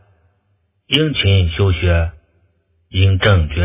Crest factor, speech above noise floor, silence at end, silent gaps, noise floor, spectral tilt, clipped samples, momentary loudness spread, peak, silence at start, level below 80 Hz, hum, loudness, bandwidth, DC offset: 16 dB; 50 dB; 0 s; none; -63 dBFS; -10.5 dB/octave; under 0.1%; 5 LU; 0 dBFS; 0.9 s; -24 dBFS; none; -15 LUFS; 3.8 kHz; under 0.1%